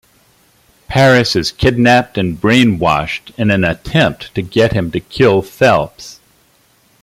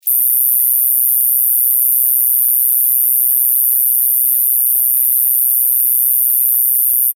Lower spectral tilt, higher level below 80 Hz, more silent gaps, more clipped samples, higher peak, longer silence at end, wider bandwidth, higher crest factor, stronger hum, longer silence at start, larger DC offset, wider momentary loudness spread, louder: first, -6 dB/octave vs 13 dB/octave; first, -38 dBFS vs under -90 dBFS; neither; neither; about the same, 0 dBFS vs 0 dBFS; first, 0.9 s vs 0.05 s; second, 15.5 kHz vs over 20 kHz; about the same, 14 dB vs 12 dB; neither; first, 0.9 s vs 0.05 s; neither; first, 10 LU vs 0 LU; second, -13 LUFS vs -10 LUFS